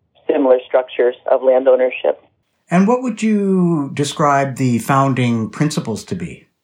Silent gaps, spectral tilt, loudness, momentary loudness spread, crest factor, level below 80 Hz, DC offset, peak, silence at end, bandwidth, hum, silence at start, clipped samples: none; -6.5 dB/octave; -16 LUFS; 9 LU; 14 dB; -60 dBFS; under 0.1%; -2 dBFS; 0.3 s; 16 kHz; none; 0.3 s; under 0.1%